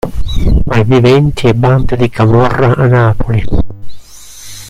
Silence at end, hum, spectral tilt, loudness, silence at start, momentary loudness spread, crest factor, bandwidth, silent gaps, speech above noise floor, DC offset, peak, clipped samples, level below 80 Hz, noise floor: 0 s; none; -7.5 dB/octave; -10 LUFS; 0.05 s; 10 LU; 10 dB; 13 kHz; none; 24 dB; under 0.1%; 0 dBFS; 0.2%; -18 dBFS; -32 dBFS